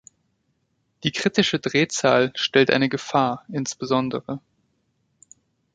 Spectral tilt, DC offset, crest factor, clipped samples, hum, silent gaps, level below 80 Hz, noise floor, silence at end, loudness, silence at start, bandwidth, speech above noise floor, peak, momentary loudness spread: -4 dB/octave; under 0.1%; 22 dB; under 0.1%; none; none; -62 dBFS; -71 dBFS; 1.35 s; -21 LUFS; 1.05 s; 9.4 kHz; 49 dB; -2 dBFS; 10 LU